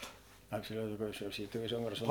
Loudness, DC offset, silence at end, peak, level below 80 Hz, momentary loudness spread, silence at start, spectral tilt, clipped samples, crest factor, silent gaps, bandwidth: -40 LUFS; under 0.1%; 0 s; -14 dBFS; -64 dBFS; 8 LU; 0 s; -5 dB/octave; under 0.1%; 26 dB; none; 19 kHz